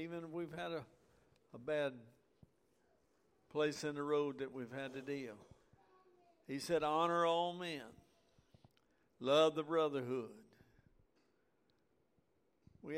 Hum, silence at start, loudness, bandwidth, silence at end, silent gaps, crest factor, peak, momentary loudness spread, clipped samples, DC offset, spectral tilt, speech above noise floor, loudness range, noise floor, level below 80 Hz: none; 0 s; -39 LUFS; 16 kHz; 0 s; none; 22 dB; -20 dBFS; 16 LU; under 0.1%; under 0.1%; -5 dB/octave; 40 dB; 7 LU; -79 dBFS; -78 dBFS